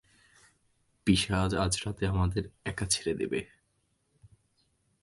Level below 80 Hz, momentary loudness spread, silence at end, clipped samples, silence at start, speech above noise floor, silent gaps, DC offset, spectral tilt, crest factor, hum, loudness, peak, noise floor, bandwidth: -46 dBFS; 10 LU; 1.55 s; under 0.1%; 1.05 s; 45 dB; none; under 0.1%; -4.5 dB/octave; 22 dB; none; -30 LUFS; -10 dBFS; -75 dBFS; 12 kHz